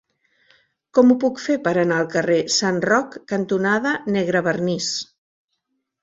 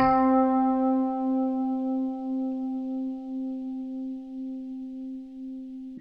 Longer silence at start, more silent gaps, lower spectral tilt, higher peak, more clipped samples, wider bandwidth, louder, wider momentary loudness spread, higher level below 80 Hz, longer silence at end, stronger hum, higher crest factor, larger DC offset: first, 0.95 s vs 0 s; neither; second, -4.5 dB/octave vs -9 dB/octave; first, -2 dBFS vs -12 dBFS; neither; first, 8 kHz vs 5.2 kHz; first, -20 LUFS vs -28 LUFS; second, 8 LU vs 16 LU; second, -64 dBFS vs -58 dBFS; first, 1 s vs 0 s; neither; about the same, 18 dB vs 14 dB; neither